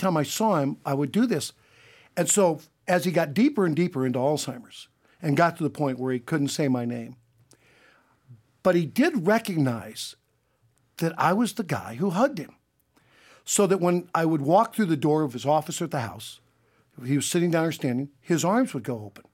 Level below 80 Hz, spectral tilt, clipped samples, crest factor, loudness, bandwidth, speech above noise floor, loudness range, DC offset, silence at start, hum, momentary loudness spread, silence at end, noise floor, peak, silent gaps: -72 dBFS; -5 dB/octave; under 0.1%; 20 dB; -25 LUFS; 17 kHz; 43 dB; 4 LU; under 0.1%; 0 s; none; 14 LU; 0.25 s; -68 dBFS; -6 dBFS; none